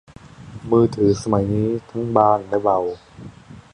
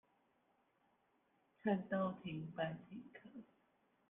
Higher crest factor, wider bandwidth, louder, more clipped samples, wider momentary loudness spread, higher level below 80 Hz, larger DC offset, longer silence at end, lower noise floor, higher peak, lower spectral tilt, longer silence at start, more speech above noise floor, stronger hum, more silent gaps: about the same, 20 dB vs 22 dB; first, 10.5 kHz vs 3.8 kHz; first, -19 LUFS vs -43 LUFS; neither; about the same, 20 LU vs 19 LU; first, -46 dBFS vs -82 dBFS; neither; second, 0.15 s vs 0.65 s; second, -39 dBFS vs -79 dBFS; first, -2 dBFS vs -26 dBFS; about the same, -8 dB/octave vs -9 dB/octave; second, 0.4 s vs 1.65 s; second, 20 dB vs 36 dB; neither; neither